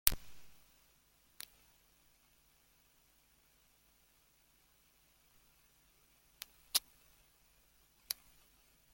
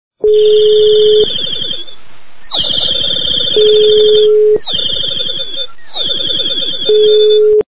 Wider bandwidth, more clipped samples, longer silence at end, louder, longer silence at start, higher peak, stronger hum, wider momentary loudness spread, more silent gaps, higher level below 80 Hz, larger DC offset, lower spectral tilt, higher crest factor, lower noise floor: first, 17 kHz vs 4 kHz; neither; first, 0.8 s vs 0 s; second, -40 LUFS vs -10 LUFS; about the same, 0.05 s vs 0.1 s; about the same, -2 dBFS vs 0 dBFS; neither; first, 30 LU vs 10 LU; neither; second, -60 dBFS vs -44 dBFS; second, under 0.1% vs 9%; second, 0.5 dB/octave vs -8 dB/octave; first, 46 dB vs 10 dB; first, -71 dBFS vs -42 dBFS